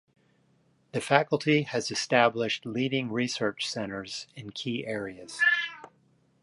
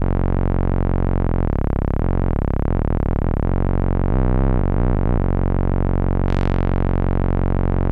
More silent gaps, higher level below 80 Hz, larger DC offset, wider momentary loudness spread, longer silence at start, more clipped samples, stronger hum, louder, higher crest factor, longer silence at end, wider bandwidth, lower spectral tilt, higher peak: neither; second, -70 dBFS vs -20 dBFS; neither; first, 13 LU vs 2 LU; first, 0.95 s vs 0 s; neither; neither; second, -28 LUFS vs -21 LUFS; first, 26 dB vs 12 dB; first, 0.55 s vs 0 s; first, 11.5 kHz vs 4.1 kHz; second, -4 dB/octave vs -11 dB/octave; about the same, -4 dBFS vs -6 dBFS